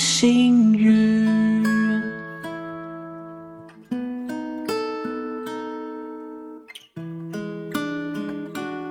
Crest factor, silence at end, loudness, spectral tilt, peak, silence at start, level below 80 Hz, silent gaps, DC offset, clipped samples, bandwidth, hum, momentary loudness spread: 16 dB; 0 s; -22 LUFS; -4.5 dB/octave; -6 dBFS; 0 s; -62 dBFS; none; under 0.1%; under 0.1%; 16 kHz; none; 21 LU